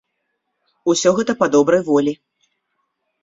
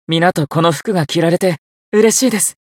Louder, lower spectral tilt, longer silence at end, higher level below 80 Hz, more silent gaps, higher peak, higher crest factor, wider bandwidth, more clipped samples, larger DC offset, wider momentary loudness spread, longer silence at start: second, -17 LUFS vs -14 LUFS; about the same, -4.5 dB/octave vs -4 dB/octave; first, 1.1 s vs 0.25 s; about the same, -60 dBFS vs -60 dBFS; second, none vs 1.58-1.92 s; about the same, -2 dBFS vs 0 dBFS; about the same, 18 dB vs 14 dB; second, 8 kHz vs 16.5 kHz; neither; neither; first, 9 LU vs 6 LU; first, 0.85 s vs 0.1 s